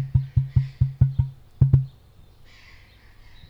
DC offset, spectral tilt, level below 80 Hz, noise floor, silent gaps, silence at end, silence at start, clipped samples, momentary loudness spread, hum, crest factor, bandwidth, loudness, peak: under 0.1%; -10.5 dB/octave; -36 dBFS; -50 dBFS; none; 1.6 s; 0 s; under 0.1%; 9 LU; none; 18 dB; 5 kHz; -23 LUFS; -6 dBFS